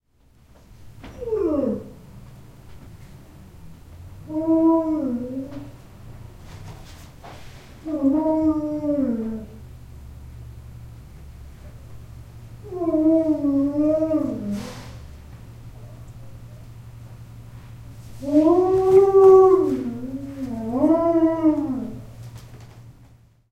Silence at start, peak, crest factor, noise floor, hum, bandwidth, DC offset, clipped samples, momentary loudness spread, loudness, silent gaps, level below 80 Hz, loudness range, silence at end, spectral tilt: 0.8 s; -2 dBFS; 20 dB; -56 dBFS; none; 11.5 kHz; 0.1%; under 0.1%; 26 LU; -20 LUFS; none; -46 dBFS; 17 LU; 0.6 s; -8.5 dB/octave